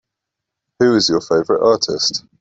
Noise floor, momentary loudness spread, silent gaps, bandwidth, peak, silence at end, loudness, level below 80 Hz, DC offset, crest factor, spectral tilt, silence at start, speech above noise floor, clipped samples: -81 dBFS; 4 LU; none; 8 kHz; -2 dBFS; 0.2 s; -15 LUFS; -56 dBFS; under 0.1%; 14 dB; -3.5 dB/octave; 0.8 s; 66 dB; under 0.1%